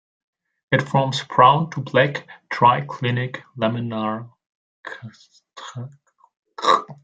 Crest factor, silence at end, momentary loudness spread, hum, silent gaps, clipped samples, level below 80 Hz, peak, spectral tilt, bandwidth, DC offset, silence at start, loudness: 20 dB; 0.1 s; 22 LU; none; 4.46-4.83 s, 6.37-6.43 s; under 0.1%; -64 dBFS; -2 dBFS; -6 dB/octave; 9.2 kHz; under 0.1%; 0.7 s; -20 LUFS